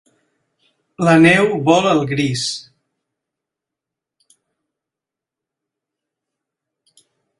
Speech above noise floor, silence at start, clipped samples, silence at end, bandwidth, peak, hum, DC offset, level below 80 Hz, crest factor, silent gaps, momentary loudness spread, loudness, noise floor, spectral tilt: 72 dB; 1 s; under 0.1%; 4.8 s; 11.5 kHz; 0 dBFS; none; under 0.1%; -56 dBFS; 20 dB; none; 12 LU; -14 LUFS; -86 dBFS; -5.5 dB/octave